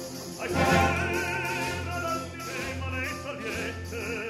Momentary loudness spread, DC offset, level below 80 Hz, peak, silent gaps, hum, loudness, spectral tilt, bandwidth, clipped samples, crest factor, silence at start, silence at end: 11 LU; under 0.1%; -46 dBFS; -10 dBFS; none; none; -29 LUFS; -4.5 dB/octave; 16 kHz; under 0.1%; 20 dB; 0 s; 0 s